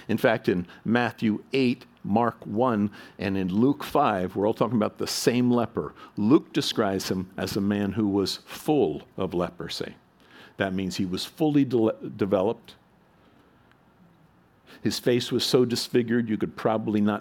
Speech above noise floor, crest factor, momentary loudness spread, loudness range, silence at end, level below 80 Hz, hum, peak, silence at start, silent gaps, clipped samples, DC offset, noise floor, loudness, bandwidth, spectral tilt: 34 dB; 20 dB; 8 LU; 4 LU; 0 s; -62 dBFS; none; -6 dBFS; 0 s; none; under 0.1%; under 0.1%; -59 dBFS; -26 LUFS; 18 kHz; -5.5 dB/octave